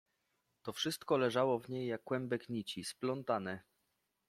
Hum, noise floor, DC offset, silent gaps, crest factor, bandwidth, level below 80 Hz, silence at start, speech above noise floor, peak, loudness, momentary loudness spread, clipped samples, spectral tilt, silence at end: none; -83 dBFS; under 0.1%; none; 20 dB; 15.5 kHz; -80 dBFS; 0.65 s; 46 dB; -20 dBFS; -38 LUFS; 12 LU; under 0.1%; -5 dB/octave; 0.7 s